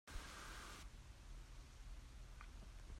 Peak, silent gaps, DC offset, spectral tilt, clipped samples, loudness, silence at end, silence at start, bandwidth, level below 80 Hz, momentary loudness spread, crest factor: -36 dBFS; none; under 0.1%; -3.5 dB/octave; under 0.1%; -58 LUFS; 0 s; 0.05 s; 16 kHz; -56 dBFS; 7 LU; 18 dB